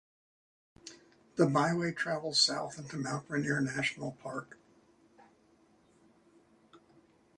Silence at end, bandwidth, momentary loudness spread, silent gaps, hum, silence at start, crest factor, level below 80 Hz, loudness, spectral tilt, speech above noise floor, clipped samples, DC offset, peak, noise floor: 0.6 s; 11 kHz; 19 LU; none; none; 0.85 s; 24 dB; -72 dBFS; -32 LUFS; -4 dB/octave; 34 dB; under 0.1%; under 0.1%; -12 dBFS; -66 dBFS